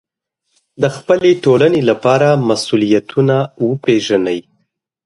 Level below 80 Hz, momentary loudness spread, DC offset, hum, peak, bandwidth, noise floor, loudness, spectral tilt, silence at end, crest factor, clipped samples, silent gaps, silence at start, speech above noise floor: -56 dBFS; 8 LU; under 0.1%; none; 0 dBFS; 11.5 kHz; -71 dBFS; -14 LUFS; -6 dB/octave; 0.65 s; 14 dB; under 0.1%; none; 0.8 s; 59 dB